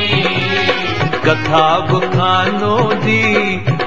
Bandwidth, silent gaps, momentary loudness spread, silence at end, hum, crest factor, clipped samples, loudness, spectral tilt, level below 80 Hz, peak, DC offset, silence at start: 7.8 kHz; none; 3 LU; 0 s; none; 14 dB; under 0.1%; -14 LUFS; -6 dB/octave; -44 dBFS; 0 dBFS; 3%; 0 s